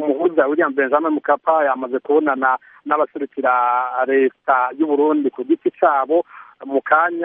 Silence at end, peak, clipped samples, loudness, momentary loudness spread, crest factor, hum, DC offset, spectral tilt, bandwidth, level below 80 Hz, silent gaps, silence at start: 0 s; 0 dBFS; under 0.1%; -18 LUFS; 6 LU; 16 dB; none; under 0.1%; -3 dB/octave; 3.8 kHz; -78 dBFS; none; 0 s